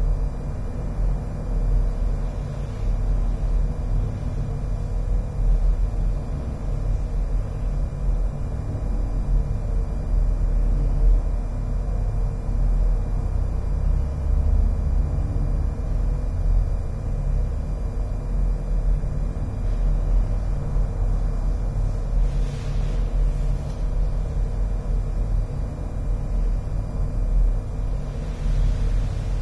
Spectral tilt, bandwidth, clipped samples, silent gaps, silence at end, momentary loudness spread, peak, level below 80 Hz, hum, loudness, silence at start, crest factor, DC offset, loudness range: -8.5 dB/octave; 6 kHz; under 0.1%; none; 0 s; 5 LU; -8 dBFS; -22 dBFS; none; -27 LUFS; 0 s; 12 dB; under 0.1%; 2 LU